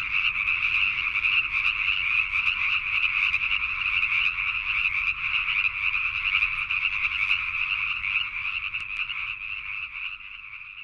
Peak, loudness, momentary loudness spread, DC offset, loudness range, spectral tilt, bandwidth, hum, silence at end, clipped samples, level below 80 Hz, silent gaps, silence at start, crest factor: -10 dBFS; -23 LUFS; 9 LU; under 0.1%; 4 LU; -1 dB/octave; 10 kHz; none; 0 s; under 0.1%; -50 dBFS; none; 0 s; 18 dB